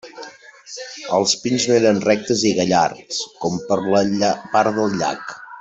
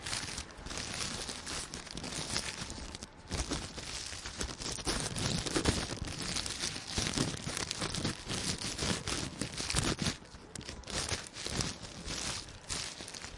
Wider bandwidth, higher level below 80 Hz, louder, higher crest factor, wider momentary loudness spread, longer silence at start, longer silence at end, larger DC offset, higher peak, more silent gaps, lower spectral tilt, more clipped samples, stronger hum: second, 8.2 kHz vs 11.5 kHz; second, -58 dBFS vs -50 dBFS; first, -18 LUFS vs -36 LUFS; second, 16 dB vs 30 dB; first, 17 LU vs 9 LU; about the same, 0.05 s vs 0 s; about the same, 0 s vs 0 s; neither; first, -2 dBFS vs -8 dBFS; neither; about the same, -4 dB/octave vs -3 dB/octave; neither; neither